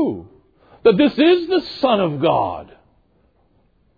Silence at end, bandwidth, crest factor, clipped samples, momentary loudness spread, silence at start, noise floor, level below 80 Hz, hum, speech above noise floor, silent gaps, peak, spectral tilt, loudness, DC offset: 1.35 s; 5 kHz; 16 dB; under 0.1%; 11 LU; 0 s; -60 dBFS; -54 dBFS; none; 43 dB; none; -2 dBFS; -8.5 dB/octave; -17 LUFS; under 0.1%